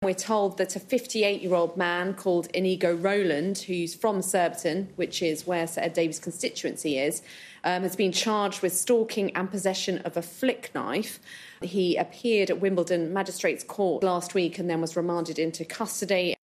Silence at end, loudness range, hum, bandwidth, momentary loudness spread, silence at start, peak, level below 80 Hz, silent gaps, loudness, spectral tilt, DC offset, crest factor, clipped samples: 0.1 s; 2 LU; none; 14.5 kHz; 7 LU; 0 s; -10 dBFS; -74 dBFS; none; -27 LUFS; -4 dB/octave; under 0.1%; 16 dB; under 0.1%